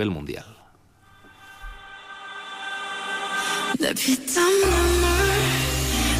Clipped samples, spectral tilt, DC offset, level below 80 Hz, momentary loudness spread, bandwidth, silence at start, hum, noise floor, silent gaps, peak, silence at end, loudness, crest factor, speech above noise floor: under 0.1%; -3.5 dB/octave; under 0.1%; -32 dBFS; 21 LU; 16 kHz; 0 s; none; -55 dBFS; none; -10 dBFS; 0 s; -22 LUFS; 14 dB; 33 dB